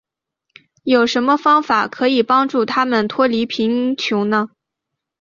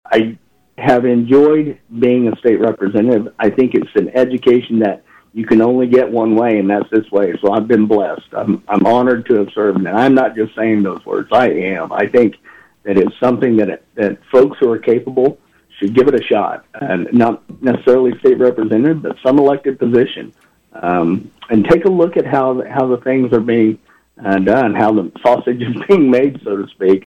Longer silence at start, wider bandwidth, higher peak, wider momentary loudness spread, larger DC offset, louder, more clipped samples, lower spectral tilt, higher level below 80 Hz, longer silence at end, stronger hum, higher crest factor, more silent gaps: first, 0.85 s vs 0.1 s; about the same, 7.4 kHz vs 7.2 kHz; about the same, -2 dBFS vs -2 dBFS; second, 5 LU vs 8 LU; neither; about the same, -16 LUFS vs -14 LUFS; neither; second, -5 dB/octave vs -8.5 dB/octave; second, -62 dBFS vs -52 dBFS; first, 0.75 s vs 0.15 s; neither; about the same, 14 dB vs 12 dB; neither